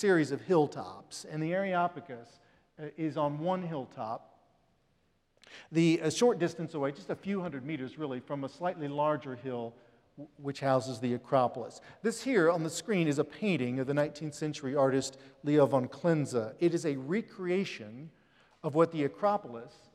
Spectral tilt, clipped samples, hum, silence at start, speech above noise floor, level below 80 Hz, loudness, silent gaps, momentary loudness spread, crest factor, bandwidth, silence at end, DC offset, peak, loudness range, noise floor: -6 dB/octave; under 0.1%; none; 0 s; 41 dB; -76 dBFS; -32 LUFS; none; 16 LU; 20 dB; 13 kHz; 0.25 s; under 0.1%; -12 dBFS; 6 LU; -72 dBFS